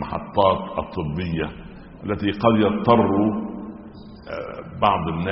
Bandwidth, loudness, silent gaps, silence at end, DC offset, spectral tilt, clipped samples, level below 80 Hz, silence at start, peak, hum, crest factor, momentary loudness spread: 5.8 kHz; -21 LUFS; none; 0 s; under 0.1%; -5.5 dB/octave; under 0.1%; -44 dBFS; 0 s; -2 dBFS; none; 20 dB; 20 LU